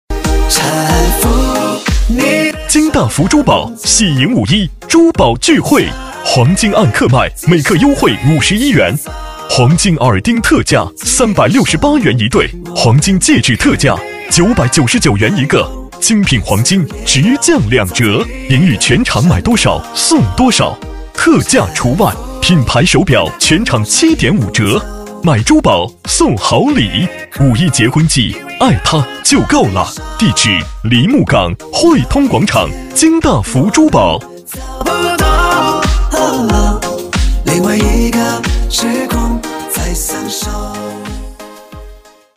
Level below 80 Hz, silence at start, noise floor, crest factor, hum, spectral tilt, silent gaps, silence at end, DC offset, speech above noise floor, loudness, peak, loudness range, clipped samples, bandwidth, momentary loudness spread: -22 dBFS; 0.1 s; -36 dBFS; 10 dB; none; -4.5 dB/octave; none; 0.4 s; 0.4%; 26 dB; -11 LUFS; 0 dBFS; 3 LU; under 0.1%; 16.5 kHz; 8 LU